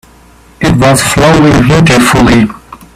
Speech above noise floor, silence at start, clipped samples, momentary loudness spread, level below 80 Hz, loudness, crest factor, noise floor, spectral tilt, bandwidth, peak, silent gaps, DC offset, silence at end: 33 dB; 0.6 s; 0.3%; 6 LU; -26 dBFS; -6 LUFS; 8 dB; -38 dBFS; -5 dB/octave; 15.5 kHz; 0 dBFS; none; under 0.1%; 0.2 s